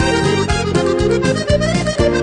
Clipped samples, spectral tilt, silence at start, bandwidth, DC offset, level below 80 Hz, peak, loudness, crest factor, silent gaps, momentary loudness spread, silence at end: under 0.1%; -5.5 dB/octave; 0 s; 10 kHz; under 0.1%; -26 dBFS; -2 dBFS; -16 LUFS; 12 dB; none; 1 LU; 0 s